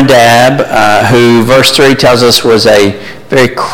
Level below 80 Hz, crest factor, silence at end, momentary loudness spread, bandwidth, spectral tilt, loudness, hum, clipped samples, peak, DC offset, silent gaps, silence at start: -34 dBFS; 6 dB; 0 s; 5 LU; 17.5 kHz; -4 dB/octave; -5 LUFS; none; 0.7%; 0 dBFS; under 0.1%; none; 0 s